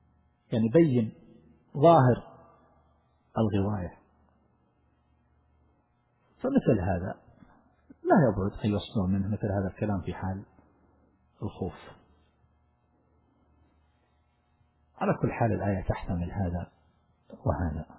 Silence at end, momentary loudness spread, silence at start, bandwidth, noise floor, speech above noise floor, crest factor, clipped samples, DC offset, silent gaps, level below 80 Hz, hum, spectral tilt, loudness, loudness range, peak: 0.15 s; 15 LU; 0.5 s; 4 kHz; -70 dBFS; 43 dB; 22 dB; under 0.1%; under 0.1%; none; -46 dBFS; none; -8 dB/octave; -28 LUFS; 15 LU; -8 dBFS